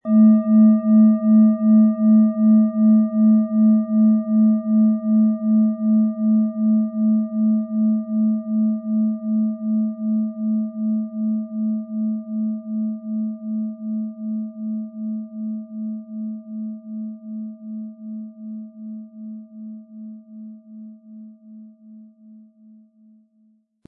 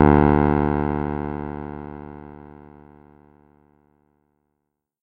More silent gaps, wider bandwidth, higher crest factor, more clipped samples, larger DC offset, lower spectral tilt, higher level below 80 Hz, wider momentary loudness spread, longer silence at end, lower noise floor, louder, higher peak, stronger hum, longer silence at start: neither; second, 2 kHz vs 4.5 kHz; second, 14 dB vs 24 dB; neither; neither; first, -15.5 dB/octave vs -12 dB/octave; second, -88 dBFS vs -34 dBFS; second, 20 LU vs 25 LU; second, 1.85 s vs 2.45 s; second, -60 dBFS vs -78 dBFS; about the same, -19 LUFS vs -21 LUFS; second, -6 dBFS vs 0 dBFS; neither; about the same, 0.05 s vs 0 s